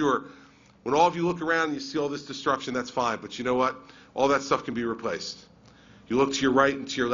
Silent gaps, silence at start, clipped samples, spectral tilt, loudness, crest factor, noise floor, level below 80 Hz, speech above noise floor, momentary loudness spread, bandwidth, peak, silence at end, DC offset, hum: none; 0 s; under 0.1%; -4.5 dB/octave; -26 LUFS; 20 dB; -53 dBFS; -60 dBFS; 27 dB; 9 LU; 7.6 kHz; -8 dBFS; 0 s; under 0.1%; none